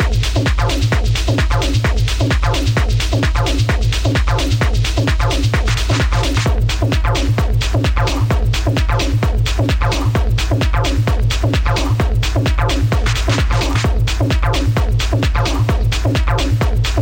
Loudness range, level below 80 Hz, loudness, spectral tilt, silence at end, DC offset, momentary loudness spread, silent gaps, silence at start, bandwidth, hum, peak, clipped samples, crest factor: 0 LU; -18 dBFS; -16 LUFS; -5.5 dB/octave; 0 s; under 0.1%; 1 LU; none; 0 s; 16.5 kHz; none; -6 dBFS; under 0.1%; 8 dB